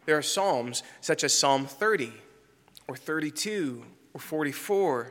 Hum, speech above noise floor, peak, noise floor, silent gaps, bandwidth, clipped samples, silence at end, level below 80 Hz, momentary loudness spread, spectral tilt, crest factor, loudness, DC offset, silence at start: none; 31 dB; -10 dBFS; -59 dBFS; none; 17 kHz; under 0.1%; 0 s; -78 dBFS; 19 LU; -2.5 dB/octave; 20 dB; -27 LUFS; under 0.1%; 0.05 s